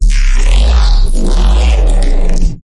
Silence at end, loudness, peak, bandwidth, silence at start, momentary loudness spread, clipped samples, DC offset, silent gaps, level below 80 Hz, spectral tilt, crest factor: 0.15 s; -13 LUFS; 0 dBFS; 11 kHz; 0 s; 5 LU; under 0.1%; under 0.1%; none; -8 dBFS; -5 dB/octave; 6 dB